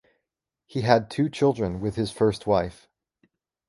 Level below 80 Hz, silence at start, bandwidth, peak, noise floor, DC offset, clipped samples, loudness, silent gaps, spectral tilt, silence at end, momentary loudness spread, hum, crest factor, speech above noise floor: -50 dBFS; 0.75 s; 11.5 kHz; -2 dBFS; -84 dBFS; under 0.1%; under 0.1%; -25 LUFS; none; -6.5 dB/octave; 0.95 s; 7 LU; none; 24 dB; 61 dB